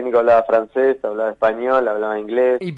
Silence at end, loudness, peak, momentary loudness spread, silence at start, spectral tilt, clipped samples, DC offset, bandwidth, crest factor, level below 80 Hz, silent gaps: 0 s; -18 LUFS; -4 dBFS; 7 LU; 0 s; -7.5 dB/octave; under 0.1%; under 0.1%; 7.6 kHz; 12 dB; -58 dBFS; none